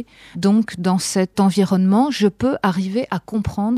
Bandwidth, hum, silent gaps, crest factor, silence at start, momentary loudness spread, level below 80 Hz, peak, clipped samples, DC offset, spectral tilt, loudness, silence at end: 14 kHz; none; none; 12 dB; 0 s; 7 LU; -46 dBFS; -6 dBFS; under 0.1%; under 0.1%; -6 dB/octave; -18 LUFS; 0 s